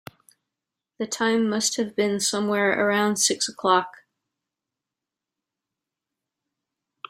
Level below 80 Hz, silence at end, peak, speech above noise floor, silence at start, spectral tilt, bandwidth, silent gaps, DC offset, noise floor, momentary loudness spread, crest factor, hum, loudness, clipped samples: -72 dBFS; 3.2 s; -4 dBFS; 64 dB; 1 s; -2.5 dB/octave; 16 kHz; none; under 0.1%; -87 dBFS; 4 LU; 22 dB; none; -22 LUFS; under 0.1%